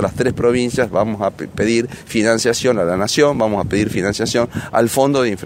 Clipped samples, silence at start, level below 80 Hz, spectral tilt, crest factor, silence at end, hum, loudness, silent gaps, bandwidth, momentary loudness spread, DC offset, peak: under 0.1%; 0 s; -42 dBFS; -5 dB/octave; 16 dB; 0 s; none; -17 LUFS; none; 16 kHz; 5 LU; under 0.1%; 0 dBFS